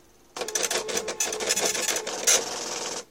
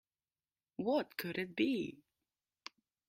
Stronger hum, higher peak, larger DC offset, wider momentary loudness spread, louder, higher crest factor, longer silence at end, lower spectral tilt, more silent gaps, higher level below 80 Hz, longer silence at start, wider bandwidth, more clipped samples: neither; first, -6 dBFS vs -22 dBFS; neither; second, 10 LU vs 19 LU; first, -25 LUFS vs -38 LUFS; about the same, 22 dB vs 20 dB; second, 0.05 s vs 1.15 s; second, 0.5 dB/octave vs -5.5 dB/octave; neither; first, -66 dBFS vs -80 dBFS; second, 0.35 s vs 0.8 s; about the same, 17 kHz vs 16 kHz; neither